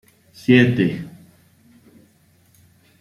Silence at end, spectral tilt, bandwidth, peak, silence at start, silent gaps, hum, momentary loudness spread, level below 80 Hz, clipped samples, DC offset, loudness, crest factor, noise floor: 1.9 s; -7.5 dB/octave; 13 kHz; 0 dBFS; 0.5 s; none; none; 19 LU; -58 dBFS; under 0.1%; under 0.1%; -17 LUFS; 22 dB; -57 dBFS